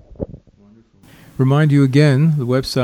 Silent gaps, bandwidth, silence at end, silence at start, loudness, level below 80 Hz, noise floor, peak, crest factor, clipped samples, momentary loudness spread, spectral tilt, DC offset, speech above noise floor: none; 13 kHz; 0 s; 0.2 s; -15 LUFS; -44 dBFS; -49 dBFS; -2 dBFS; 14 dB; under 0.1%; 18 LU; -7.5 dB/octave; under 0.1%; 36 dB